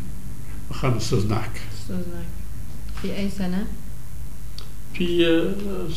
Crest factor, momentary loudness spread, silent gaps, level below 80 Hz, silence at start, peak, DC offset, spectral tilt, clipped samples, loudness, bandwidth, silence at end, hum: 18 dB; 18 LU; none; -36 dBFS; 0 s; -8 dBFS; 7%; -6 dB/octave; under 0.1%; -26 LUFS; 16 kHz; 0 s; none